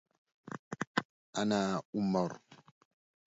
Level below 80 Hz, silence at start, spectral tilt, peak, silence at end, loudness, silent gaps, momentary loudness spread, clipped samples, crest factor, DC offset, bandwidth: -72 dBFS; 0.45 s; -5 dB/octave; -12 dBFS; 0.7 s; -35 LUFS; 0.59-0.71 s, 0.87-0.95 s, 1.05-1.33 s, 1.85-1.93 s; 16 LU; under 0.1%; 24 dB; under 0.1%; 7.6 kHz